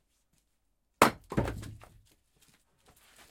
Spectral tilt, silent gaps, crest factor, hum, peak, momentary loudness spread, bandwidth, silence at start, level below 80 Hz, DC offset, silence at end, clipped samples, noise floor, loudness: -4.5 dB/octave; none; 30 dB; none; -4 dBFS; 19 LU; 16.5 kHz; 1 s; -52 dBFS; under 0.1%; 1.55 s; under 0.1%; -77 dBFS; -29 LUFS